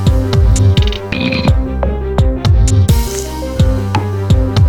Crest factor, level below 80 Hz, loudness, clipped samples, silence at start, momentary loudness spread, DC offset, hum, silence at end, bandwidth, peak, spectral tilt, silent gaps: 10 dB; -16 dBFS; -13 LUFS; under 0.1%; 0 s; 7 LU; under 0.1%; none; 0 s; 17.5 kHz; 0 dBFS; -6 dB/octave; none